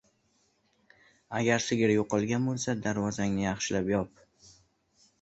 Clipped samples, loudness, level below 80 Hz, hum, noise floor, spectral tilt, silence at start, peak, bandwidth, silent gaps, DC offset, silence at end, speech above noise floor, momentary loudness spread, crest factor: under 0.1%; -29 LUFS; -58 dBFS; none; -71 dBFS; -5 dB/octave; 1.3 s; -12 dBFS; 8.2 kHz; none; under 0.1%; 1.15 s; 42 dB; 5 LU; 20 dB